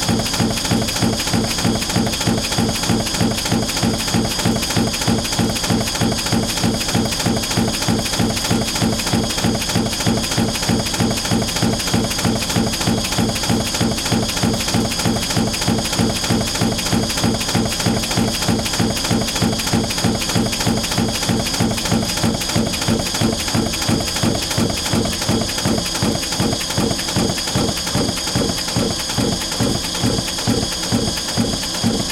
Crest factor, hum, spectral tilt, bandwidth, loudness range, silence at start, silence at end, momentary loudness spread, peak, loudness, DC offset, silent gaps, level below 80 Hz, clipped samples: 16 dB; none; -3.5 dB/octave; 17 kHz; 1 LU; 0 s; 0 s; 1 LU; -2 dBFS; -18 LUFS; under 0.1%; none; -34 dBFS; under 0.1%